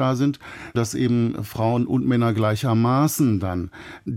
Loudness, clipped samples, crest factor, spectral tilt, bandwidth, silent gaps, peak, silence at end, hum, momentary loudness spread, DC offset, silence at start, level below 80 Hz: -22 LUFS; under 0.1%; 12 dB; -6.5 dB/octave; 16.5 kHz; none; -8 dBFS; 0 s; none; 10 LU; under 0.1%; 0 s; -52 dBFS